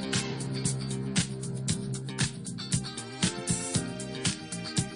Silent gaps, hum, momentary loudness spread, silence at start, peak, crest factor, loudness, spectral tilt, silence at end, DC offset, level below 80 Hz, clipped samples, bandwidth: none; none; 5 LU; 0 s; -12 dBFS; 20 dB; -31 LUFS; -4 dB/octave; 0 s; under 0.1%; -54 dBFS; under 0.1%; 11 kHz